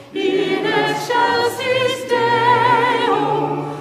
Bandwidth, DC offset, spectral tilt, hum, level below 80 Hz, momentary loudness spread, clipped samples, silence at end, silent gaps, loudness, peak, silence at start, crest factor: 15.5 kHz; under 0.1%; -4.5 dB/octave; none; -62 dBFS; 5 LU; under 0.1%; 0 s; none; -17 LUFS; -4 dBFS; 0 s; 14 dB